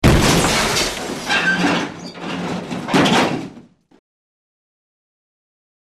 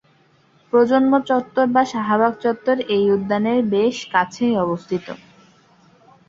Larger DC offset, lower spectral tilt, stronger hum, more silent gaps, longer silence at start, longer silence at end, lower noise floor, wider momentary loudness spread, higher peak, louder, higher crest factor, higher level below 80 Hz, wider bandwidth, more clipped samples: neither; second, -4 dB/octave vs -6 dB/octave; neither; neither; second, 0 s vs 0.75 s; first, 2.3 s vs 1.1 s; second, -44 dBFS vs -57 dBFS; first, 14 LU vs 7 LU; about the same, 0 dBFS vs -2 dBFS; about the same, -17 LUFS vs -19 LUFS; about the same, 20 dB vs 18 dB; first, -32 dBFS vs -60 dBFS; first, 13.5 kHz vs 7.8 kHz; neither